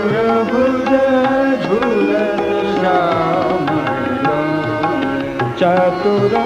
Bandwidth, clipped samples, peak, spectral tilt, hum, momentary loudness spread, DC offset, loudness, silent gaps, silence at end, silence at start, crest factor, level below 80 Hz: 11.5 kHz; under 0.1%; -2 dBFS; -7 dB/octave; none; 4 LU; under 0.1%; -15 LUFS; none; 0 s; 0 s; 12 dB; -46 dBFS